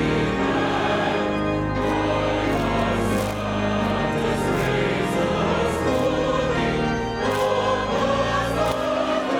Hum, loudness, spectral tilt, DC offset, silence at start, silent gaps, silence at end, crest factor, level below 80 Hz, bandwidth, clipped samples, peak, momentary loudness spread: none; -22 LUFS; -5.5 dB/octave; under 0.1%; 0 s; none; 0 s; 12 dB; -38 dBFS; 19 kHz; under 0.1%; -10 dBFS; 2 LU